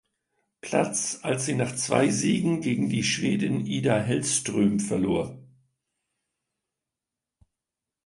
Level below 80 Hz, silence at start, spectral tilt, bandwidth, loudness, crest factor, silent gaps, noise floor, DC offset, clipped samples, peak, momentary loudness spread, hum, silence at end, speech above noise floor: -60 dBFS; 0.65 s; -4.5 dB/octave; 11.5 kHz; -25 LUFS; 20 dB; none; -88 dBFS; under 0.1%; under 0.1%; -6 dBFS; 5 LU; none; 2.6 s; 63 dB